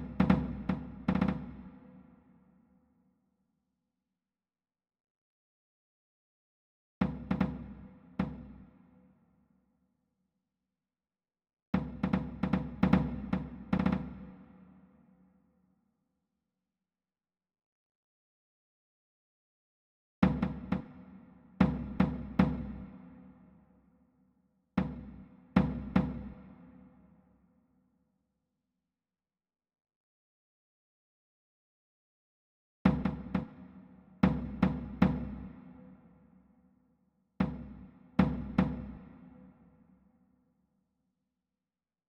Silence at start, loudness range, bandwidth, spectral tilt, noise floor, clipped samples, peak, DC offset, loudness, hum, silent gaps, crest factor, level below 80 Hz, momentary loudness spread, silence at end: 0 s; 9 LU; 5.8 kHz; -9.5 dB/octave; under -90 dBFS; under 0.1%; -10 dBFS; under 0.1%; -33 LUFS; none; 5.10-7.01 s, 11.53-11.73 s, 17.66-20.22 s, 29.81-29.85 s, 29.96-32.85 s; 28 dB; -50 dBFS; 23 LU; 2.6 s